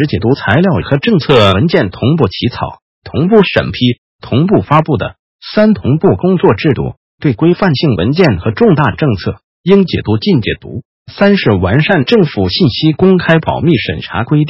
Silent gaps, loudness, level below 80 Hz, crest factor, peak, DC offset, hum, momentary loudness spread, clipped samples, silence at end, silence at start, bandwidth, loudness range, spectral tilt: 2.82-3.02 s, 3.98-4.19 s, 5.19-5.39 s, 6.97-7.18 s, 9.44-9.64 s, 10.85-11.05 s; -11 LUFS; -34 dBFS; 10 dB; 0 dBFS; under 0.1%; none; 9 LU; 0.3%; 0 s; 0 s; 8 kHz; 2 LU; -8.5 dB/octave